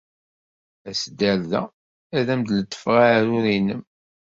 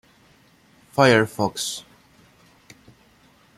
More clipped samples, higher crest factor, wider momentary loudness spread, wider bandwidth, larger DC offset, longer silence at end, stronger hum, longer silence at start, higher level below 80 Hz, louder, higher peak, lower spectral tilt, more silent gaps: neither; about the same, 20 dB vs 22 dB; second, 11 LU vs 14 LU; second, 7.8 kHz vs 15.5 kHz; neither; second, 0.5 s vs 1.75 s; neither; about the same, 0.85 s vs 0.95 s; about the same, -58 dBFS vs -62 dBFS; about the same, -21 LUFS vs -20 LUFS; about the same, -4 dBFS vs -2 dBFS; about the same, -5.5 dB/octave vs -4.5 dB/octave; first, 1.73-2.10 s vs none